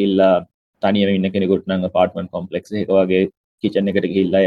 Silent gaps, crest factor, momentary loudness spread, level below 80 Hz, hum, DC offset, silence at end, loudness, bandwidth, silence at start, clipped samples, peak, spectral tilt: 0.54-0.73 s, 3.37-3.58 s; 16 dB; 10 LU; -60 dBFS; none; under 0.1%; 0 s; -18 LUFS; 6.2 kHz; 0 s; under 0.1%; -2 dBFS; -8.5 dB/octave